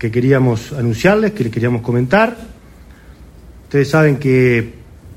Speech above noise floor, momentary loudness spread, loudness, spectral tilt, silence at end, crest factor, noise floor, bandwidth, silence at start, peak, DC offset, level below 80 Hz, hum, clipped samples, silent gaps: 26 dB; 7 LU; -14 LUFS; -7.5 dB/octave; 0 s; 16 dB; -40 dBFS; 15.5 kHz; 0 s; 0 dBFS; under 0.1%; -42 dBFS; none; under 0.1%; none